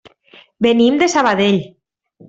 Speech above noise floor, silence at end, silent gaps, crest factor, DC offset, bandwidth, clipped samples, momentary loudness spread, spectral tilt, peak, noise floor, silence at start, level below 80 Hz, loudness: 35 dB; 0.6 s; none; 14 dB; under 0.1%; 8 kHz; under 0.1%; 6 LU; -4.5 dB/octave; -2 dBFS; -48 dBFS; 0.6 s; -56 dBFS; -14 LUFS